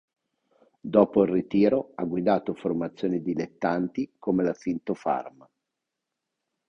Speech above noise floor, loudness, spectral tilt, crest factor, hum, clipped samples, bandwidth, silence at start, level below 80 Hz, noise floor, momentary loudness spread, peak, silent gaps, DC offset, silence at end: 59 dB; -26 LUFS; -8.5 dB/octave; 22 dB; none; under 0.1%; 6.8 kHz; 0.85 s; -62 dBFS; -85 dBFS; 9 LU; -4 dBFS; none; under 0.1%; 1.4 s